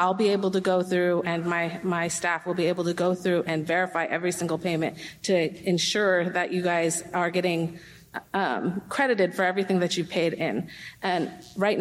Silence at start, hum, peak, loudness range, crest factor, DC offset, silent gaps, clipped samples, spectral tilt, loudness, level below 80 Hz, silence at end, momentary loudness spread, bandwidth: 0 s; none; -10 dBFS; 1 LU; 16 dB; under 0.1%; none; under 0.1%; -4.5 dB/octave; -26 LUFS; -66 dBFS; 0 s; 6 LU; 15.5 kHz